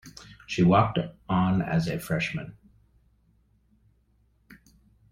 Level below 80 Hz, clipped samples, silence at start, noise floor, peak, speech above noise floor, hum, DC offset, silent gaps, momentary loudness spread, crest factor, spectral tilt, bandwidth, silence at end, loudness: -54 dBFS; under 0.1%; 0.05 s; -66 dBFS; -6 dBFS; 41 dB; none; under 0.1%; none; 21 LU; 22 dB; -7 dB/octave; 15.5 kHz; 2.6 s; -26 LUFS